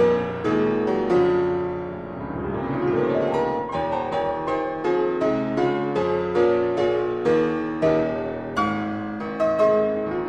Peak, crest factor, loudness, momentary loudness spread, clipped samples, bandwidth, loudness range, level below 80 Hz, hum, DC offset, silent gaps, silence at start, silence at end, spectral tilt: -8 dBFS; 14 dB; -23 LUFS; 8 LU; under 0.1%; 8.2 kHz; 2 LU; -50 dBFS; none; under 0.1%; none; 0 s; 0 s; -7.5 dB/octave